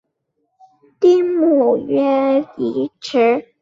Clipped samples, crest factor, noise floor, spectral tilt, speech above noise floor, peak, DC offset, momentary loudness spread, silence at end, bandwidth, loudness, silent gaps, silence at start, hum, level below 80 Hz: under 0.1%; 14 dB; -71 dBFS; -6 dB/octave; 55 dB; -4 dBFS; under 0.1%; 8 LU; 0.2 s; 7.6 kHz; -16 LUFS; none; 1 s; none; -66 dBFS